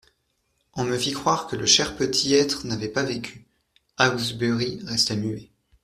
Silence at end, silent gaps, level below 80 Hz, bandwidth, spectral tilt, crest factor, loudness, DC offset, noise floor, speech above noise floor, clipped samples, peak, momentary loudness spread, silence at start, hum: 0.4 s; none; -56 dBFS; 14.5 kHz; -3 dB/octave; 24 dB; -23 LUFS; under 0.1%; -72 dBFS; 48 dB; under 0.1%; -2 dBFS; 12 LU; 0.75 s; none